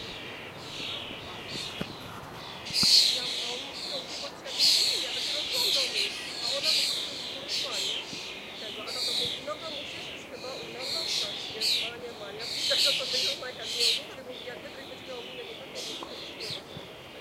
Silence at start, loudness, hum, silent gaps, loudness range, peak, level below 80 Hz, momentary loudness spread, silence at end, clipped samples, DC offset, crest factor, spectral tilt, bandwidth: 0 s; -28 LUFS; none; none; 8 LU; -6 dBFS; -64 dBFS; 17 LU; 0 s; under 0.1%; under 0.1%; 24 dB; -0.5 dB/octave; 16 kHz